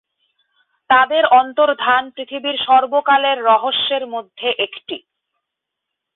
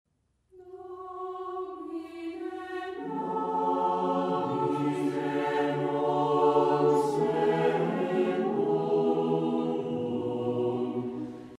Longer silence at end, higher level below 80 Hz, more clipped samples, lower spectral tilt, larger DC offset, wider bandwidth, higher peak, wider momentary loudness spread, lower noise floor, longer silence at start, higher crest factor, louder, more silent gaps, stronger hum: first, 1.15 s vs 0 s; first, -64 dBFS vs -70 dBFS; neither; about the same, -7 dB/octave vs -7.5 dB/octave; neither; second, 4.2 kHz vs 12 kHz; first, -2 dBFS vs -12 dBFS; about the same, 14 LU vs 13 LU; first, -80 dBFS vs -66 dBFS; first, 0.9 s vs 0.55 s; about the same, 16 dB vs 16 dB; first, -15 LUFS vs -29 LUFS; neither; neither